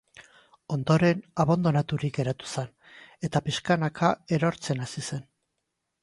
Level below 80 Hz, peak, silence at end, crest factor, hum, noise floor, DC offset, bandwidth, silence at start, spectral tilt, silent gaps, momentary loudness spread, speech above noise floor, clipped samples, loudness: -60 dBFS; -8 dBFS; 0.8 s; 20 dB; none; -81 dBFS; under 0.1%; 11.5 kHz; 0.2 s; -6 dB/octave; none; 12 LU; 55 dB; under 0.1%; -27 LUFS